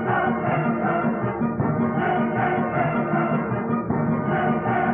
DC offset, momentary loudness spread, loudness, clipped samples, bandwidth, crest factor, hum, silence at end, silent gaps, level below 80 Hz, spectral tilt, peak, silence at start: under 0.1%; 2 LU; -23 LUFS; under 0.1%; 3.5 kHz; 12 dB; none; 0 s; none; -50 dBFS; -7 dB/octave; -10 dBFS; 0 s